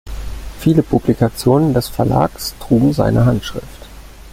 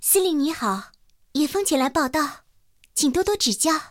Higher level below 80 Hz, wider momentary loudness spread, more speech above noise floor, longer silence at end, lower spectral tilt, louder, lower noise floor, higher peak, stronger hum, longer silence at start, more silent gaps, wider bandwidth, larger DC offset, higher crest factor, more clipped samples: first, -32 dBFS vs -52 dBFS; first, 16 LU vs 10 LU; second, 21 dB vs 39 dB; about the same, 0.05 s vs 0.05 s; first, -7 dB/octave vs -2 dB/octave; first, -15 LUFS vs -22 LUFS; second, -35 dBFS vs -60 dBFS; first, 0 dBFS vs -6 dBFS; neither; about the same, 0.05 s vs 0 s; neither; about the same, 16.5 kHz vs 17.5 kHz; neither; about the same, 16 dB vs 16 dB; neither